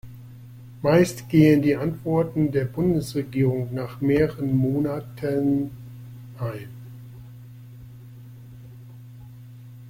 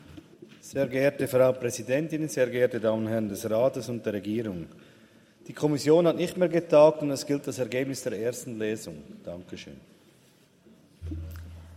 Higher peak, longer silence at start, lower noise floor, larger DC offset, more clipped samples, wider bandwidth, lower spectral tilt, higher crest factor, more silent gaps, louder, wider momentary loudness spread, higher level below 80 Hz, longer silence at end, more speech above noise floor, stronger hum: about the same, -4 dBFS vs -6 dBFS; about the same, 0.05 s vs 0.1 s; second, -43 dBFS vs -60 dBFS; neither; neither; about the same, 16.5 kHz vs 16 kHz; first, -8 dB/octave vs -6 dB/octave; about the same, 20 dB vs 20 dB; neither; first, -23 LUFS vs -26 LUFS; first, 24 LU vs 20 LU; first, -52 dBFS vs -60 dBFS; about the same, 0 s vs 0 s; second, 21 dB vs 34 dB; neither